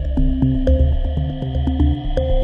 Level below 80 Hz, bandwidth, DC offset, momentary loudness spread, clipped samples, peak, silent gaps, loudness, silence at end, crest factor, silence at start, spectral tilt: -18 dBFS; 3.9 kHz; under 0.1%; 6 LU; under 0.1%; -4 dBFS; none; -19 LUFS; 0 s; 12 dB; 0 s; -10 dB/octave